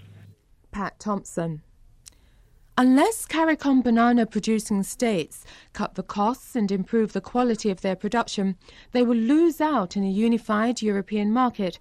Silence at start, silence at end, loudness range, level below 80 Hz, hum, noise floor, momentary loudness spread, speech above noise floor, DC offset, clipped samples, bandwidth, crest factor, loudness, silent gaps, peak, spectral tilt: 0.75 s; 0.05 s; 4 LU; -54 dBFS; none; -56 dBFS; 12 LU; 33 dB; under 0.1%; under 0.1%; 14.5 kHz; 14 dB; -24 LUFS; none; -10 dBFS; -5.5 dB/octave